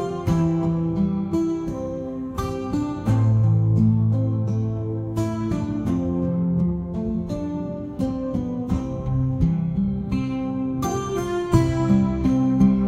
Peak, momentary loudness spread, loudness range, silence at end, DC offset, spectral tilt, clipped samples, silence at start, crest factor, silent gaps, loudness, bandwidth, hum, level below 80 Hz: -4 dBFS; 9 LU; 3 LU; 0 s; under 0.1%; -8.5 dB/octave; under 0.1%; 0 s; 18 dB; none; -23 LUFS; 13 kHz; none; -38 dBFS